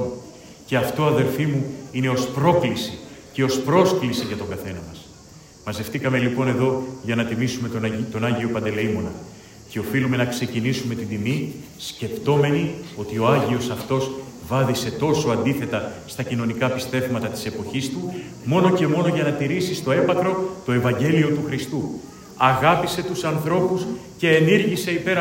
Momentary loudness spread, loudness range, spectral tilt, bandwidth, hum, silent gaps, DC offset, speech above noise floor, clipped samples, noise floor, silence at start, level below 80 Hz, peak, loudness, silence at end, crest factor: 13 LU; 4 LU; -6 dB/octave; 16.5 kHz; none; none; under 0.1%; 24 dB; under 0.1%; -45 dBFS; 0 s; -54 dBFS; -2 dBFS; -22 LUFS; 0 s; 20 dB